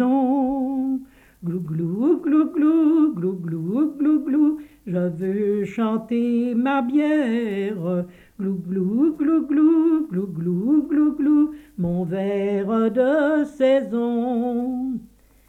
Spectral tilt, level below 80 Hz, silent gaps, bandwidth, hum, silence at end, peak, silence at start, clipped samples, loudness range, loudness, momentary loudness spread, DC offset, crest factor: -9 dB/octave; -58 dBFS; none; 4.2 kHz; none; 0.45 s; -8 dBFS; 0 s; under 0.1%; 2 LU; -21 LUFS; 9 LU; under 0.1%; 12 dB